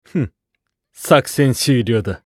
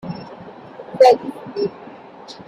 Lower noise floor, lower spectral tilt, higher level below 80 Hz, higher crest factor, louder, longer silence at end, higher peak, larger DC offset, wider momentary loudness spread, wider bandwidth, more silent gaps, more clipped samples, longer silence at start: first, -75 dBFS vs -39 dBFS; about the same, -5.5 dB/octave vs -5.5 dB/octave; first, -48 dBFS vs -62 dBFS; about the same, 18 dB vs 18 dB; about the same, -16 LUFS vs -17 LUFS; about the same, 0.1 s vs 0.15 s; about the same, 0 dBFS vs -2 dBFS; neither; second, 12 LU vs 26 LU; first, 16 kHz vs 11.5 kHz; neither; neither; about the same, 0.15 s vs 0.05 s